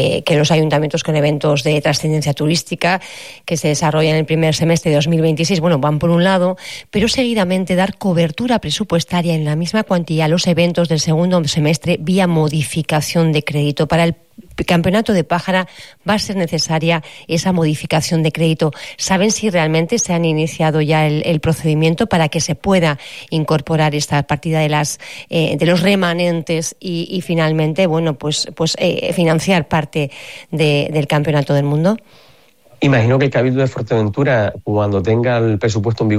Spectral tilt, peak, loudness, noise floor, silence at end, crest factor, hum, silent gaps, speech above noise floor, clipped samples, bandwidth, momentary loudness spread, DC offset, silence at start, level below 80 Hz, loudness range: -5.5 dB/octave; -4 dBFS; -16 LUFS; -49 dBFS; 0 s; 12 dB; none; none; 34 dB; under 0.1%; 14.5 kHz; 5 LU; 0.5%; 0 s; -46 dBFS; 2 LU